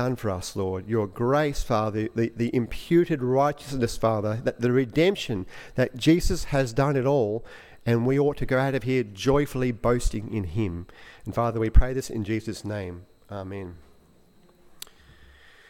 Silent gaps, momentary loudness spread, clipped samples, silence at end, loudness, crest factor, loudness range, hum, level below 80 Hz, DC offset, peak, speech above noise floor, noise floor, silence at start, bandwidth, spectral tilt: none; 14 LU; under 0.1%; 1.9 s; -26 LUFS; 20 dB; 5 LU; none; -34 dBFS; under 0.1%; -4 dBFS; 32 dB; -56 dBFS; 0 s; 16.5 kHz; -6.5 dB/octave